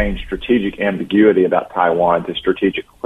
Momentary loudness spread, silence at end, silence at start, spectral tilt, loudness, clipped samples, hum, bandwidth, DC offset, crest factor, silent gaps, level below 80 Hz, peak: 8 LU; 0.25 s; 0 s; -7.5 dB/octave; -16 LUFS; under 0.1%; none; 4 kHz; under 0.1%; 16 dB; none; -36 dBFS; 0 dBFS